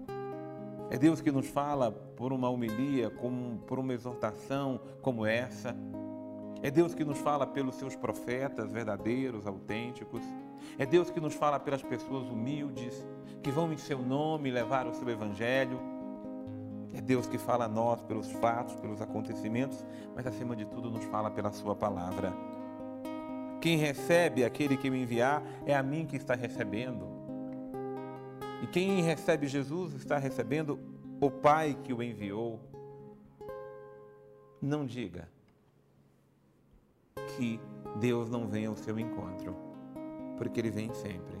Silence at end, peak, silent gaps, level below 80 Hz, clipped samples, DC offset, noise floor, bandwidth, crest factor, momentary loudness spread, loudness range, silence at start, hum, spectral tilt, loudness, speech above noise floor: 0 s; -14 dBFS; none; -66 dBFS; under 0.1%; under 0.1%; -66 dBFS; 16 kHz; 20 dB; 14 LU; 7 LU; 0 s; none; -6.5 dB/octave; -34 LUFS; 34 dB